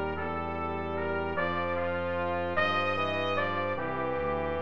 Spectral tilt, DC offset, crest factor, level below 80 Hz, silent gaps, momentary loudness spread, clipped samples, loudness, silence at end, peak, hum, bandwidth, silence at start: -7 dB/octave; 0.6%; 16 dB; -50 dBFS; none; 6 LU; under 0.1%; -30 LUFS; 0 s; -14 dBFS; none; 7.2 kHz; 0 s